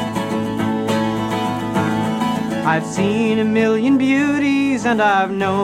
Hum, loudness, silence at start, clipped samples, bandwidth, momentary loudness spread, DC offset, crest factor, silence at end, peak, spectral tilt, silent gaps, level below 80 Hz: none; -18 LUFS; 0 s; under 0.1%; 15.5 kHz; 5 LU; under 0.1%; 14 dB; 0 s; -4 dBFS; -6 dB/octave; none; -52 dBFS